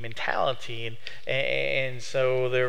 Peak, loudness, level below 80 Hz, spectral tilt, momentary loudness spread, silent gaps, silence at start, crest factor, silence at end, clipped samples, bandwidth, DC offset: -10 dBFS; -28 LUFS; -62 dBFS; -4.5 dB/octave; 10 LU; none; 0 s; 18 dB; 0 s; under 0.1%; 15 kHz; 3%